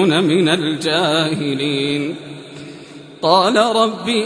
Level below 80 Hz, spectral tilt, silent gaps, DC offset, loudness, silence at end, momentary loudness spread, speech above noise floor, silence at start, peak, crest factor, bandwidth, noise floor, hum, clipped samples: -60 dBFS; -5 dB/octave; none; under 0.1%; -16 LUFS; 0 s; 20 LU; 21 dB; 0 s; 0 dBFS; 16 dB; 11 kHz; -37 dBFS; none; under 0.1%